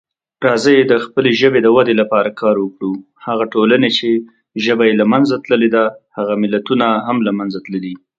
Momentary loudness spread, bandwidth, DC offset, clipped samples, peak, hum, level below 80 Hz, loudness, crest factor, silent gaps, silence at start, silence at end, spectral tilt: 11 LU; 9 kHz; under 0.1%; under 0.1%; 0 dBFS; none; -60 dBFS; -14 LUFS; 14 dB; none; 0.4 s; 0.2 s; -6 dB/octave